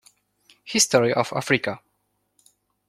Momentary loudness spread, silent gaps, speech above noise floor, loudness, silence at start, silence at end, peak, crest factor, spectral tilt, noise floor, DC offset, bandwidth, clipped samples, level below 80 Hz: 12 LU; none; 51 dB; -21 LUFS; 0.65 s; 1.1 s; -4 dBFS; 22 dB; -3 dB/octave; -72 dBFS; under 0.1%; 16 kHz; under 0.1%; -64 dBFS